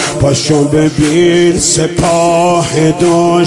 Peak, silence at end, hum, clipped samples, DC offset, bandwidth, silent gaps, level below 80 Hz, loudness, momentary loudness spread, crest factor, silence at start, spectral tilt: 0 dBFS; 0 s; none; under 0.1%; 0.4%; 11.5 kHz; none; -34 dBFS; -10 LUFS; 3 LU; 10 dB; 0 s; -5 dB/octave